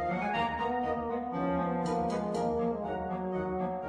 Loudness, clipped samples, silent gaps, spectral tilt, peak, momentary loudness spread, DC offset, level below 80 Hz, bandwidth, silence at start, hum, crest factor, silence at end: -32 LUFS; under 0.1%; none; -7 dB/octave; -18 dBFS; 3 LU; under 0.1%; -54 dBFS; 10.5 kHz; 0 s; none; 14 dB; 0 s